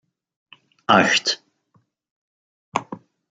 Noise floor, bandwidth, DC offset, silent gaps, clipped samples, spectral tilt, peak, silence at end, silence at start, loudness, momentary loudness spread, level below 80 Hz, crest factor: -64 dBFS; 9.4 kHz; under 0.1%; 2.11-2.72 s; under 0.1%; -3 dB/octave; -2 dBFS; 0.35 s; 0.9 s; -19 LUFS; 22 LU; -70 dBFS; 24 dB